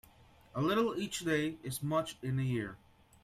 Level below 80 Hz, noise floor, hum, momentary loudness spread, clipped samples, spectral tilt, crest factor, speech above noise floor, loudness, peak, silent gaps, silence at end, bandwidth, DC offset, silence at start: -64 dBFS; -61 dBFS; none; 7 LU; under 0.1%; -5.5 dB/octave; 18 dB; 27 dB; -35 LUFS; -18 dBFS; none; 0.45 s; 16 kHz; under 0.1%; 0.55 s